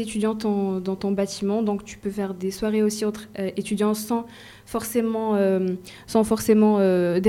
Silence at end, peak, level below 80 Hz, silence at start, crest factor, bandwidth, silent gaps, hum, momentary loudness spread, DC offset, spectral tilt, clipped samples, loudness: 0 s; -6 dBFS; -54 dBFS; 0 s; 18 dB; 16 kHz; none; none; 11 LU; under 0.1%; -6 dB/octave; under 0.1%; -24 LUFS